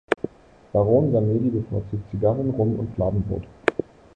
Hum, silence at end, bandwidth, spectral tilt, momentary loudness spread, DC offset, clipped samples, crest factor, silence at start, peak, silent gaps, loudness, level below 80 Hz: none; 0.35 s; 9 kHz; -9 dB/octave; 11 LU; under 0.1%; under 0.1%; 20 dB; 0.1 s; -2 dBFS; none; -23 LUFS; -44 dBFS